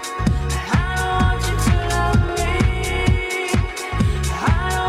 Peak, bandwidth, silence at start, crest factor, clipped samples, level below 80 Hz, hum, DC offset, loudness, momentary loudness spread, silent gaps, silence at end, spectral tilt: -4 dBFS; 15.5 kHz; 0 s; 16 dB; under 0.1%; -24 dBFS; none; under 0.1%; -20 LUFS; 3 LU; none; 0 s; -5 dB/octave